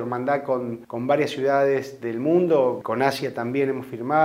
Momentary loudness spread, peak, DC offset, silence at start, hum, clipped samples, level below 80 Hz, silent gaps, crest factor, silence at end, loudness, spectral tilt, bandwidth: 8 LU; -6 dBFS; under 0.1%; 0 s; none; under 0.1%; -68 dBFS; none; 18 dB; 0 s; -23 LUFS; -6.5 dB/octave; 16 kHz